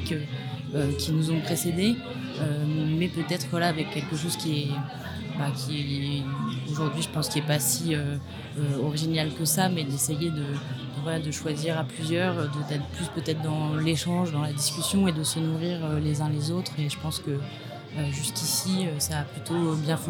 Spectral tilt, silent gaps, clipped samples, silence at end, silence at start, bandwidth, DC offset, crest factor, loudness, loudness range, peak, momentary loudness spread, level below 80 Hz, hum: -4.5 dB/octave; none; under 0.1%; 0 s; 0 s; 18.5 kHz; under 0.1%; 20 dB; -28 LUFS; 3 LU; -8 dBFS; 8 LU; -54 dBFS; none